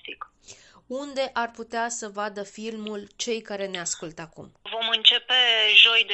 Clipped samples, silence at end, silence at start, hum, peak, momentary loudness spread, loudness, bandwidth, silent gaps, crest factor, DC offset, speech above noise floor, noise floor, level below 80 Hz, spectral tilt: under 0.1%; 0 s; 0.05 s; none; -2 dBFS; 22 LU; -21 LUFS; 8.6 kHz; none; 22 dB; under 0.1%; 27 dB; -51 dBFS; -68 dBFS; -0.5 dB/octave